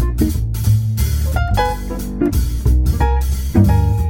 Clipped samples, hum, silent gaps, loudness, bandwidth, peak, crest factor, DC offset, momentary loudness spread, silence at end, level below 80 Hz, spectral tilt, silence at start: under 0.1%; none; none; -17 LUFS; 17 kHz; -2 dBFS; 14 dB; under 0.1%; 6 LU; 0 s; -18 dBFS; -7 dB/octave; 0 s